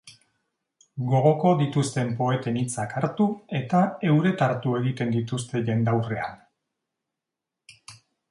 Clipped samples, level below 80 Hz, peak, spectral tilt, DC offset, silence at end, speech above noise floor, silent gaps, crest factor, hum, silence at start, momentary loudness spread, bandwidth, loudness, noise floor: under 0.1%; -64 dBFS; -8 dBFS; -7 dB/octave; under 0.1%; 0.35 s; 63 dB; none; 18 dB; none; 0.05 s; 8 LU; 11.5 kHz; -24 LUFS; -86 dBFS